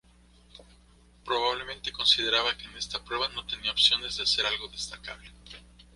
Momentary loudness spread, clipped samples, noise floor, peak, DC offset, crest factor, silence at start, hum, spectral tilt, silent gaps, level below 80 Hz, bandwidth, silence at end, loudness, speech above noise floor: 20 LU; under 0.1%; -58 dBFS; -8 dBFS; under 0.1%; 24 dB; 0.55 s; 60 Hz at -55 dBFS; -1 dB/octave; none; -54 dBFS; 11.5 kHz; 0.35 s; -26 LUFS; 29 dB